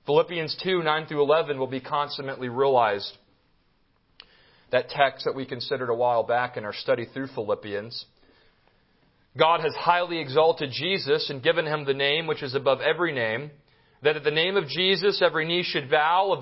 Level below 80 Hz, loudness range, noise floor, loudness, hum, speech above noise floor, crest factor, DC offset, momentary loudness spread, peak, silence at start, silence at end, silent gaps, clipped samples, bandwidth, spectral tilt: -68 dBFS; 5 LU; -66 dBFS; -25 LUFS; none; 41 dB; 22 dB; under 0.1%; 10 LU; -4 dBFS; 0.05 s; 0 s; none; under 0.1%; 5.8 kHz; -8.5 dB/octave